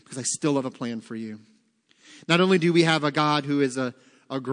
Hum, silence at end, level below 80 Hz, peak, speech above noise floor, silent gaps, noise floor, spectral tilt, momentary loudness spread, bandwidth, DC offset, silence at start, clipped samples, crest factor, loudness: none; 0 s; -76 dBFS; -4 dBFS; 40 dB; none; -64 dBFS; -4.5 dB/octave; 16 LU; 10.5 kHz; under 0.1%; 0.1 s; under 0.1%; 20 dB; -24 LUFS